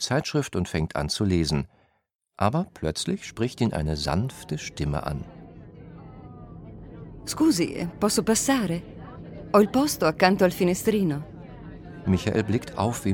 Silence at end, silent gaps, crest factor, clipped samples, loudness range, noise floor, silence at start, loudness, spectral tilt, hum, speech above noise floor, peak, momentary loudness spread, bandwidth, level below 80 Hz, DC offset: 0 s; 2.15-2.19 s; 20 dB; under 0.1%; 7 LU; -73 dBFS; 0 s; -25 LUFS; -5 dB/octave; none; 48 dB; -6 dBFS; 22 LU; 19 kHz; -44 dBFS; under 0.1%